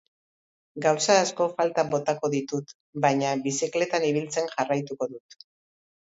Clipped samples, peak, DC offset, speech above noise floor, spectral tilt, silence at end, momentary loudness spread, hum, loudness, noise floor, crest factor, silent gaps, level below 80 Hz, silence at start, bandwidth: under 0.1%; -6 dBFS; under 0.1%; over 64 dB; -4 dB/octave; 0.85 s; 12 LU; none; -26 LUFS; under -90 dBFS; 20 dB; 2.75-2.93 s; -72 dBFS; 0.75 s; 8 kHz